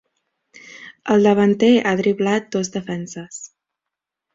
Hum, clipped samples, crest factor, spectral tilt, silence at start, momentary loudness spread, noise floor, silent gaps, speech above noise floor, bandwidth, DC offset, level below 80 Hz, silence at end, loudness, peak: none; under 0.1%; 18 dB; -5.5 dB/octave; 0.65 s; 20 LU; -84 dBFS; none; 66 dB; 7.8 kHz; under 0.1%; -62 dBFS; 0.9 s; -18 LUFS; -2 dBFS